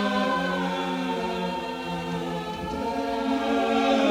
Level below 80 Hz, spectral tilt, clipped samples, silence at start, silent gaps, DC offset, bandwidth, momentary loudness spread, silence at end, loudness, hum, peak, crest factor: -50 dBFS; -5.5 dB/octave; under 0.1%; 0 s; none; under 0.1%; 16 kHz; 8 LU; 0 s; -27 LUFS; none; -10 dBFS; 16 dB